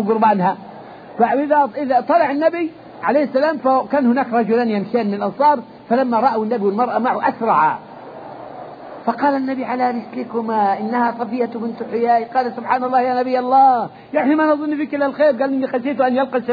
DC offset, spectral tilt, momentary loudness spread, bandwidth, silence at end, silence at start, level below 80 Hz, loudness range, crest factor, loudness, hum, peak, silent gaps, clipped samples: under 0.1%; -9 dB/octave; 11 LU; 5 kHz; 0 s; 0 s; -64 dBFS; 4 LU; 14 dB; -18 LUFS; none; -2 dBFS; none; under 0.1%